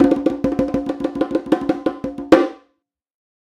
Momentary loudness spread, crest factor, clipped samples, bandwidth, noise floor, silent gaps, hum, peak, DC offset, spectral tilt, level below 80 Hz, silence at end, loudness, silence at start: 9 LU; 20 dB; under 0.1%; 11 kHz; -69 dBFS; none; none; 0 dBFS; under 0.1%; -7 dB/octave; -46 dBFS; 0.9 s; -19 LUFS; 0 s